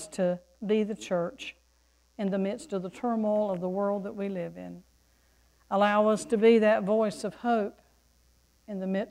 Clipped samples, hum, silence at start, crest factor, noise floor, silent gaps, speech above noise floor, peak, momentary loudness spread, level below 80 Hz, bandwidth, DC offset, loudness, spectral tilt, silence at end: under 0.1%; none; 0 s; 18 dB; -66 dBFS; none; 38 dB; -10 dBFS; 14 LU; -66 dBFS; 12 kHz; under 0.1%; -28 LUFS; -6 dB/octave; 0 s